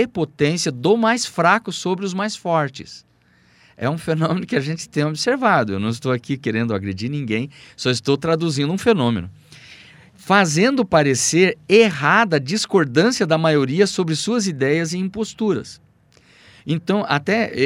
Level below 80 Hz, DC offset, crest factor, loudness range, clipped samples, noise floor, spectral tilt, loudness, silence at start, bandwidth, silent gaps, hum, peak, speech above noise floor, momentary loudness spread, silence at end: -58 dBFS; under 0.1%; 18 dB; 6 LU; under 0.1%; -56 dBFS; -4.5 dB/octave; -19 LUFS; 0 s; 15.5 kHz; none; none; -2 dBFS; 37 dB; 9 LU; 0 s